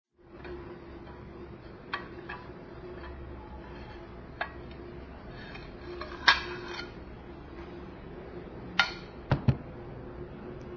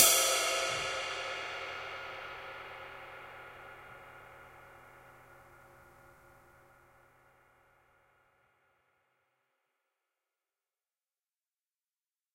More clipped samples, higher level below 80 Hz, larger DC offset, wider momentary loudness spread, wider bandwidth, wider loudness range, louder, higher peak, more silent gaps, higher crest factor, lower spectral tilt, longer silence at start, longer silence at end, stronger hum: neither; first, -50 dBFS vs -70 dBFS; neither; second, 17 LU vs 27 LU; second, 7 kHz vs 16 kHz; second, 11 LU vs 25 LU; about the same, -35 LUFS vs -33 LUFS; first, -2 dBFS vs -6 dBFS; neither; about the same, 34 dB vs 32 dB; first, -2.5 dB/octave vs 0.5 dB/octave; first, 0.2 s vs 0 s; second, 0 s vs 6.65 s; neither